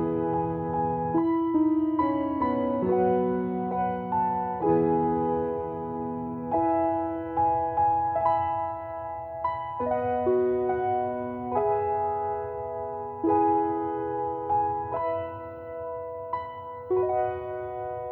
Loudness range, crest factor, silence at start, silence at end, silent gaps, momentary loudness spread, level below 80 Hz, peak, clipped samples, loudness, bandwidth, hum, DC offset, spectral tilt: 4 LU; 16 dB; 0 s; 0 s; none; 10 LU; -54 dBFS; -12 dBFS; under 0.1%; -27 LUFS; 4.3 kHz; none; under 0.1%; -11 dB/octave